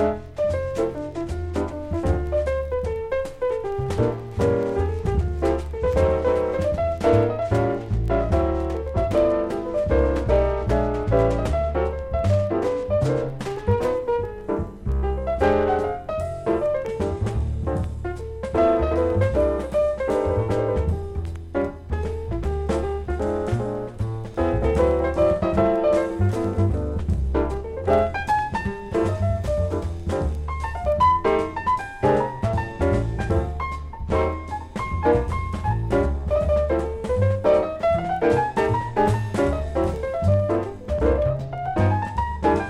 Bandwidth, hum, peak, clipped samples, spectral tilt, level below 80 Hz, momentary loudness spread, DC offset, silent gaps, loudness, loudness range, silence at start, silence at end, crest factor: 11.5 kHz; none; -6 dBFS; under 0.1%; -8 dB/octave; -32 dBFS; 8 LU; under 0.1%; none; -23 LUFS; 3 LU; 0 s; 0 s; 16 dB